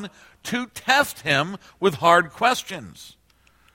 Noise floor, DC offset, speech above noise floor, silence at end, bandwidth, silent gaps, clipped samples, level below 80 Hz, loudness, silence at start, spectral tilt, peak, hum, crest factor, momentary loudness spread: -59 dBFS; under 0.1%; 36 dB; 0.65 s; 16.5 kHz; none; under 0.1%; -60 dBFS; -21 LUFS; 0 s; -3.5 dB/octave; -2 dBFS; none; 22 dB; 19 LU